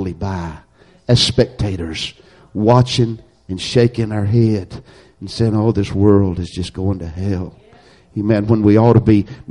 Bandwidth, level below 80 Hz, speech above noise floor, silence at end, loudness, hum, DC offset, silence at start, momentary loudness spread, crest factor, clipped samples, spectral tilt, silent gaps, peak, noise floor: 11 kHz; -38 dBFS; 31 dB; 0.1 s; -16 LUFS; none; under 0.1%; 0 s; 17 LU; 16 dB; under 0.1%; -6.5 dB/octave; none; 0 dBFS; -47 dBFS